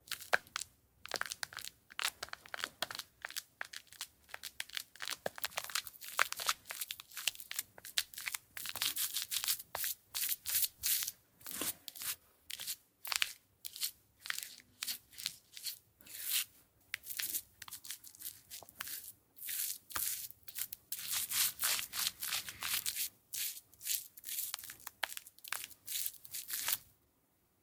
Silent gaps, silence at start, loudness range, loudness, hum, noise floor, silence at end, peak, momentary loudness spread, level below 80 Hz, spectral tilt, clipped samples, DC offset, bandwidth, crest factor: none; 0.05 s; 7 LU; -39 LUFS; none; -75 dBFS; 0.8 s; -10 dBFS; 13 LU; -76 dBFS; 1.5 dB/octave; under 0.1%; under 0.1%; 19 kHz; 32 dB